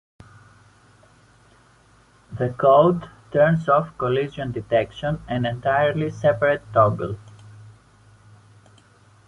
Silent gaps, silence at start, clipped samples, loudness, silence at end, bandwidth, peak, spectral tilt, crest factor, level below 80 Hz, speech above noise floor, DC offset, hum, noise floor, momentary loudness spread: none; 2.3 s; under 0.1%; -21 LUFS; 1.6 s; 10.5 kHz; -4 dBFS; -8 dB/octave; 20 dB; -52 dBFS; 35 dB; under 0.1%; none; -55 dBFS; 13 LU